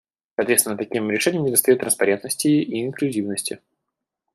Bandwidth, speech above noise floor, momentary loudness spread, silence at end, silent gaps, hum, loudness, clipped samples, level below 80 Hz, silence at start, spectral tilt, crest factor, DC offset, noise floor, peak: 15.5 kHz; 61 dB; 9 LU; 0.75 s; none; none; -20 LUFS; under 0.1%; -66 dBFS; 0.4 s; -3.5 dB/octave; 20 dB; under 0.1%; -81 dBFS; 0 dBFS